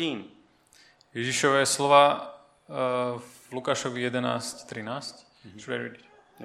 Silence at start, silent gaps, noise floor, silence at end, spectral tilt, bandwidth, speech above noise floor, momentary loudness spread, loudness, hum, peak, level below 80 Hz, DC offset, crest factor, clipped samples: 0 s; none; -59 dBFS; 0 s; -3.5 dB/octave; 15 kHz; 33 dB; 20 LU; -26 LUFS; none; -4 dBFS; -74 dBFS; under 0.1%; 24 dB; under 0.1%